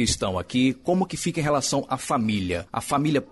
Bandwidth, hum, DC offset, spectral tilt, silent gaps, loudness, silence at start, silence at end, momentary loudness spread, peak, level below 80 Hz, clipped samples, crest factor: 12 kHz; none; under 0.1%; -4.5 dB/octave; none; -24 LUFS; 0 s; 0.05 s; 4 LU; -10 dBFS; -46 dBFS; under 0.1%; 14 dB